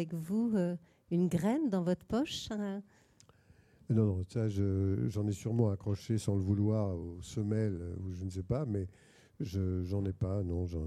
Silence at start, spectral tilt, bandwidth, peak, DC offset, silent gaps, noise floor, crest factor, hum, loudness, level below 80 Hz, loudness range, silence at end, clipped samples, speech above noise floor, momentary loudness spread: 0 s; -7.5 dB/octave; 13.5 kHz; -16 dBFS; under 0.1%; none; -64 dBFS; 18 dB; none; -34 LUFS; -56 dBFS; 4 LU; 0 s; under 0.1%; 31 dB; 9 LU